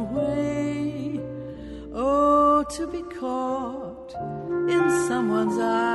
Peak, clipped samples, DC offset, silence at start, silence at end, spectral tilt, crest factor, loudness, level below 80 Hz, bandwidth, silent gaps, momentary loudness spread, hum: -10 dBFS; under 0.1%; under 0.1%; 0 s; 0 s; -6 dB/octave; 16 dB; -24 LUFS; -48 dBFS; 11.5 kHz; none; 16 LU; none